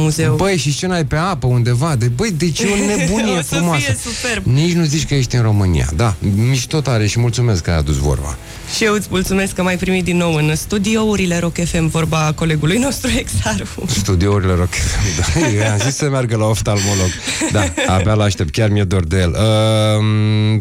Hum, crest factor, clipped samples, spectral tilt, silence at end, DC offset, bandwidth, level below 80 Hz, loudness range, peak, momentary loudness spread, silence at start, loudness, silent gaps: none; 12 dB; under 0.1%; -5 dB/octave; 0 s; under 0.1%; 16 kHz; -30 dBFS; 1 LU; -2 dBFS; 3 LU; 0 s; -16 LUFS; none